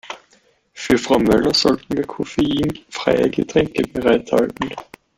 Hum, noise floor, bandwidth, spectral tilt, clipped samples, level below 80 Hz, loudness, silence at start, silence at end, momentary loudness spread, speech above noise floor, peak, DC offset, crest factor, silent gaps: none; -57 dBFS; 16 kHz; -5 dB/octave; under 0.1%; -44 dBFS; -18 LUFS; 0.05 s; 0.35 s; 12 LU; 39 dB; -2 dBFS; under 0.1%; 18 dB; none